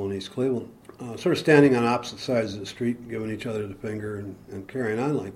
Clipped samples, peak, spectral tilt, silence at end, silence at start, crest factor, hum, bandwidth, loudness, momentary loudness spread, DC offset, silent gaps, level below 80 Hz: under 0.1%; -2 dBFS; -6.5 dB/octave; 0 s; 0 s; 22 dB; none; 13.5 kHz; -25 LUFS; 18 LU; under 0.1%; none; -60 dBFS